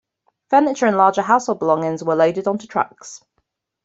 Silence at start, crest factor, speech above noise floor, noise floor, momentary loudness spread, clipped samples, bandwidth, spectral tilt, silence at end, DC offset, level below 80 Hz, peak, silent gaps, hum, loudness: 0.5 s; 18 dB; 54 dB; -71 dBFS; 9 LU; under 0.1%; 8 kHz; -5.5 dB/octave; 0.65 s; under 0.1%; -66 dBFS; -2 dBFS; none; none; -18 LUFS